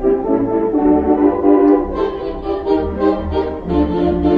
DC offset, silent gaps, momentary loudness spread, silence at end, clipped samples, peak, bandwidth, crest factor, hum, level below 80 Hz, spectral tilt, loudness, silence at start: under 0.1%; none; 8 LU; 0 s; under 0.1%; 0 dBFS; 5 kHz; 14 dB; none; -30 dBFS; -10 dB/octave; -16 LUFS; 0 s